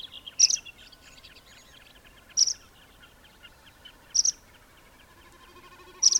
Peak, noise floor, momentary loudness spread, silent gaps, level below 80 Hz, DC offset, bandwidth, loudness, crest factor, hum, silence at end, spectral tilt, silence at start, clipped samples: -8 dBFS; -55 dBFS; 19 LU; none; -62 dBFS; under 0.1%; 18.5 kHz; -23 LUFS; 24 dB; none; 0 s; 3 dB/octave; 0.05 s; under 0.1%